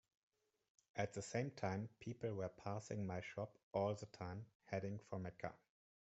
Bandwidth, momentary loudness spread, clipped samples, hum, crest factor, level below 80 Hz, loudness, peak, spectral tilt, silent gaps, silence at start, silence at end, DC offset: 8 kHz; 8 LU; under 0.1%; none; 22 dB; -78 dBFS; -47 LUFS; -26 dBFS; -6.5 dB/octave; 3.63-3.71 s, 4.55-4.60 s; 0.95 s; 0.65 s; under 0.1%